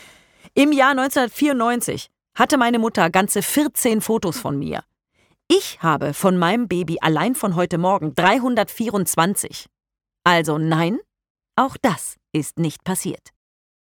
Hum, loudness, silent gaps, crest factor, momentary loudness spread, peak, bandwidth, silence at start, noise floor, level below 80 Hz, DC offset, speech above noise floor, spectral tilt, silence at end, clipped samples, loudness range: none; -19 LUFS; 11.30-11.35 s; 18 dB; 9 LU; -2 dBFS; 19 kHz; 0.55 s; -64 dBFS; -56 dBFS; under 0.1%; 45 dB; -4.5 dB/octave; 0.65 s; under 0.1%; 3 LU